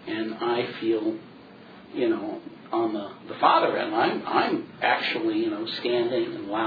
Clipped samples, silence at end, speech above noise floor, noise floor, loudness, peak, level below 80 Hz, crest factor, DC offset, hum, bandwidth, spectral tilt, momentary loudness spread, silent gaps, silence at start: under 0.1%; 0 s; 21 dB; -47 dBFS; -26 LUFS; -6 dBFS; -74 dBFS; 20 dB; under 0.1%; none; 5 kHz; -7 dB/octave; 10 LU; none; 0 s